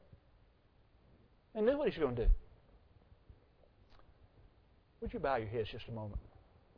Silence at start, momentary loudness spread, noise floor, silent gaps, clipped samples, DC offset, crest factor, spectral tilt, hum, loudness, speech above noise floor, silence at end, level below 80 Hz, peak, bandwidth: 1.55 s; 14 LU; -68 dBFS; none; under 0.1%; under 0.1%; 22 dB; -5.5 dB/octave; none; -38 LUFS; 33 dB; 0.55 s; -44 dBFS; -18 dBFS; 5.2 kHz